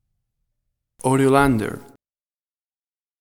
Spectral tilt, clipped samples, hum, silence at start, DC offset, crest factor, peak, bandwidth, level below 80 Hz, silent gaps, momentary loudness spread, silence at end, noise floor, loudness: -6.5 dB/octave; under 0.1%; none; 1.05 s; under 0.1%; 22 dB; -2 dBFS; 16.5 kHz; -46 dBFS; none; 14 LU; 1.4 s; under -90 dBFS; -19 LUFS